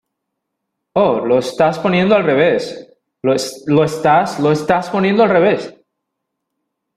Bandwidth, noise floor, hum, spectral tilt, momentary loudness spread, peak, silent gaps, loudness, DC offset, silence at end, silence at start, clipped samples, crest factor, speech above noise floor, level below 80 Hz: 14.5 kHz; -76 dBFS; none; -6 dB/octave; 9 LU; -2 dBFS; none; -15 LUFS; under 0.1%; 1.25 s; 0.95 s; under 0.1%; 14 dB; 62 dB; -54 dBFS